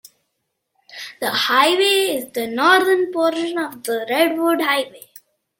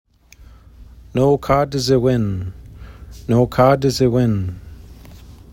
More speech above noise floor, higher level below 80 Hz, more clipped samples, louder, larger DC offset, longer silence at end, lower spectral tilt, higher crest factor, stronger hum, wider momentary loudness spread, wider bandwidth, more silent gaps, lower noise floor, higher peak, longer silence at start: first, 57 dB vs 29 dB; second, -70 dBFS vs -40 dBFS; neither; about the same, -18 LUFS vs -17 LUFS; neither; first, 0.6 s vs 0.2 s; second, -2 dB/octave vs -7 dB/octave; about the same, 18 dB vs 18 dB; neither; second, 11 LU vs 19 LU; about the same, 17 kHz vs 16.5 kHz; neither; first, -75 dBFS vs -45 dBFS; about the same, -2 dBFS vs -2 dBFS; first, 0.9 s vs 0.4 s